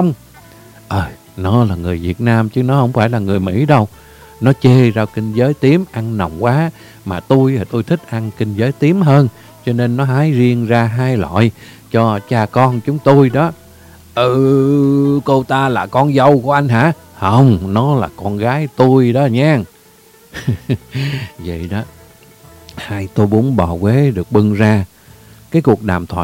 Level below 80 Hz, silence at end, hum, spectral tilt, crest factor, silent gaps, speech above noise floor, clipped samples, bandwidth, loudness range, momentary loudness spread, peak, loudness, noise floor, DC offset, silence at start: -42 dBFS; 0 s; none; -8 dB/octave; 14 dB; none; 32 dB; 0.2%; 16 kHz; 5 LU; 12 LU; 0 dBFS; -14 LUFS; -45 dBFS; under 0.1%; 0 s